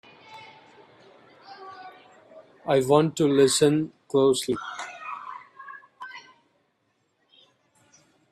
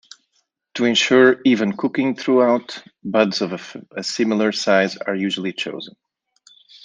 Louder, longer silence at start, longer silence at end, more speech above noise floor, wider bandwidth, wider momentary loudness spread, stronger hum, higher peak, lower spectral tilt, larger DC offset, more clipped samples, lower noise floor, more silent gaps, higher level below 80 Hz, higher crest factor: second, -23 LUFS vs -18 LUFS; second, 0.3 s vs 0.75 s; first, 2.1 s vs 0.95 s; about the same, 51 dB vs 50 dB; first, 14.5 kHz vs 9.6 kHz; first, 26 LU vs 18 LU; neither; about the same, -4 dBFS vs -2 dBFS; about the same, -4.5 dB/octave vs -4.5 dB/octave; neither; neither; about the same, -72 dBFS vs -69 dBFS; neither; about the same, -68 dBFS vs -68 dBFS; about the same, 22 dB vs 18 dB